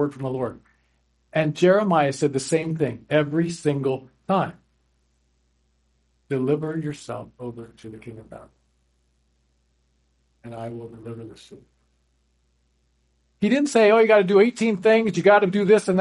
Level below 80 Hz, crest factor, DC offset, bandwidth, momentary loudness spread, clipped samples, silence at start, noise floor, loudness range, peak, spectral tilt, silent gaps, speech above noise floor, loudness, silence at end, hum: -64 dBFS; 20 dB; under 0.1%; 11.5 kHz; 21 LU; under 0.1%; 0 s; -67 dBFS; 22 LU; -4 dBFS; -6 dB/octave; none; 46 dB; -21 LUFS; 0 s; 60 Hz at -55 dBFS